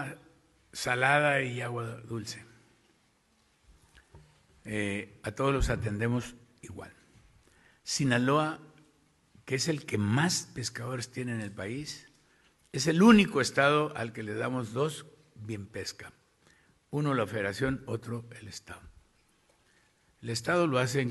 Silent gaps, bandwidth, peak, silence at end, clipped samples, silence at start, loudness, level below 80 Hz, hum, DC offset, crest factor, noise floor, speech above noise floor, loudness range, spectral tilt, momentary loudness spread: none; 12.5 kHz; -8 dBFS; 0 s; under 0.1%; 0 s; -30 LUFS; -50 dBFS; none; under 0.1%; 24 dB; -69 dBFS; 39 dB; 10 LU; -5 dB/octave; 20 LU